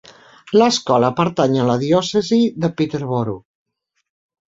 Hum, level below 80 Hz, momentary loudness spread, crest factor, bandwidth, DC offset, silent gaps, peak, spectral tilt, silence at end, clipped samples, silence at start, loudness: none; -56 dBFS; 7 LU; 16 dB; 7.8 kHz; under 0.1%; none; -2 dBFS; -5.5 dB/octave; 1.1 s; under 0.1%; 0.45 s; -17 LUFS